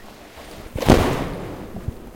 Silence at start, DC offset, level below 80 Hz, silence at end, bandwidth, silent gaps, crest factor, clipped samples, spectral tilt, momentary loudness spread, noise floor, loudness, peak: 0 s; under 0.1%; -32 dBFS; 0 s; 17 kHz; none; 22 dB; under 0.1%; -6 dB/octave; 23 LU; -40 dBFS; -20 LUFS; 0 dBFS